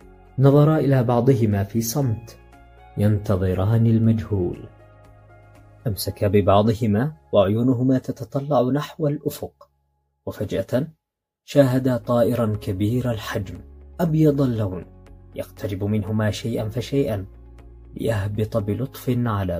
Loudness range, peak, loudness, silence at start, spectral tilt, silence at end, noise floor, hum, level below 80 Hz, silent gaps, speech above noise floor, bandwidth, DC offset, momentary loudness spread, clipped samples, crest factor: 5 LU; -2 dBFS; -21 LUFS; 0.35 s; -7.5 dB/octave; 0 s; -70 dBFS; none; -48 dBFS; none; 49 dB; 16 kHz; under 0.1%; 15 LU; under 0.1%; 20 dB